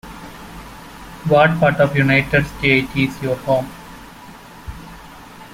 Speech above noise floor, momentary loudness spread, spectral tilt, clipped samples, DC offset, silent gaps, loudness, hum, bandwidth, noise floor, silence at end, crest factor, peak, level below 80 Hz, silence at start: 23 dB; 24 LU; -6.5 dB/octave; under 0.1%; under 0.1%; none; -16 LUFS; none; 16.5 kHz; -39 dBFS; 0 s; 18 dB; -2 dBFS; -40 dBFS; 0.05 s